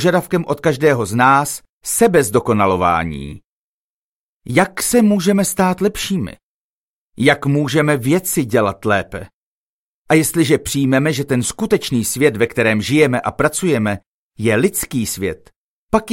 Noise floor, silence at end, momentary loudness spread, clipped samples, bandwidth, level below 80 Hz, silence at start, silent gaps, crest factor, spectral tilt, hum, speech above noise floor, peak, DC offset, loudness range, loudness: under -90 dBFS; 0 s; 8 LU; under 0.1%; 16.5 kHz; -46 dBFS; 0 s; 1.69-1.81 s, 3.44-4.40 s, 6.43-7.13 s, 9.33-10.05 s, 14.06-14.31 s, 15.56-15.89 s; 16 dB; -5 dB/octave; none; over 74 dB; 0 dBFS; under 0.1%; 2 LU; -16 LUFS